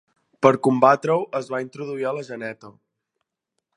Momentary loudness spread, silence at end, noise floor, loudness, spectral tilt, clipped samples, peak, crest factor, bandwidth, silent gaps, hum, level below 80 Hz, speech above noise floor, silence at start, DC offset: 16 LU; 1.05 s; -80 dBFS; -21 LUFS; -6.5 dB/octave; under 0.1%; 0 dBFS; 22 dB; 11 kHz; none; none; -70 dBFS; 59 dB; 0.4 s; under 0.1%